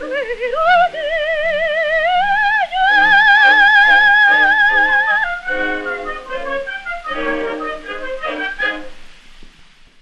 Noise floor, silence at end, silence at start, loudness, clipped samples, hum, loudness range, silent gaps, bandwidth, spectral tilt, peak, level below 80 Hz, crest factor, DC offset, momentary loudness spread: -44 dBFS; 0.55 s; 0 s; -13 LUFS; under 0.1%; none; 13 LU; none; 9.8 kHz; -2.5 dB/octave; -2 dBFS; -40 dBFS; 14 dB; under 0.1%; 16 LU